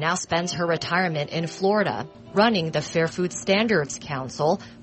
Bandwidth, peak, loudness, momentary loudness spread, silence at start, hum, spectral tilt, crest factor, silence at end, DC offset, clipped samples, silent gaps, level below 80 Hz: 8.8 kHz; -6 dBFS; -24 LUFS; 8 LU; 0 s; none; -4.5 dB/octave; 18 dB; 0 s; under 0.1%; under 0.1%; none; -58 dBFS